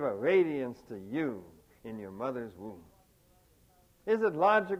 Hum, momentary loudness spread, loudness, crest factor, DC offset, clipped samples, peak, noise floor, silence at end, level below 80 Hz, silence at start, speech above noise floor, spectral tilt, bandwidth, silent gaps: none; 20 LU; -31 LUFS; 18 dB; under 0.1%; under 0.1%; -14 dBFS; -65 dBFS; 0 s; -70 dBFS; 0 s; 34 dB; -7 dB/octave; 15 kHz; none